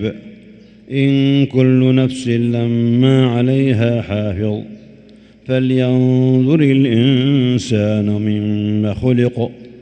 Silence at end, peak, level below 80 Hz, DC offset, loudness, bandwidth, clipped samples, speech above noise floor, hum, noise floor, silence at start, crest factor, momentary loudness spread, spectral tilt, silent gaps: 0.1 s; 0 dBFS; -48 dBFS; under 0.1%; -15 LUFS; 9 kHz; under 0.1%; 29 dB; none; -43 dBFS; 0 s; 14 dB; 9 LU; -8 dB/octave; none